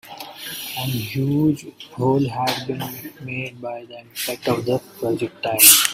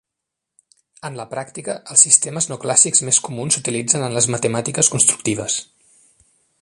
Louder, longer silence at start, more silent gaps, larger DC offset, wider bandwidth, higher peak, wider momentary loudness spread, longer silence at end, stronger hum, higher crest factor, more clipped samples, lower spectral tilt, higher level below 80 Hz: second, -20 LUFS vs -15 LUFS; second, 0.05 s vs 1.05 s; neither; neither; first, 16.5 kHz vs 13 kHz; about the same, 0 dBFS vs 0 dBFS; about the same, 15 LU vs 16 LU; second, 0 s vs 1 s; neither; about the same, 22 dB vs 20 dB; neither; about the same, -3 dB/octave vs -2.5 dB/octave; about the same, -58 dBFS vs -60 dBFS